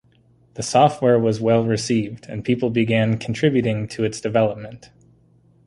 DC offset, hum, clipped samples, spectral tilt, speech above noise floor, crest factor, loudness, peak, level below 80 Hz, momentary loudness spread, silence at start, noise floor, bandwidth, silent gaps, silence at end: under 0.1%; none; under 0.1%; -6 dB/octave; 37 dB; 18 dB; -20 LUFS; -2 dBFS; -54 dBFS; 13 LU; 0.55 s; -56 dBFS; 11.5 kHz; none; 0.9 s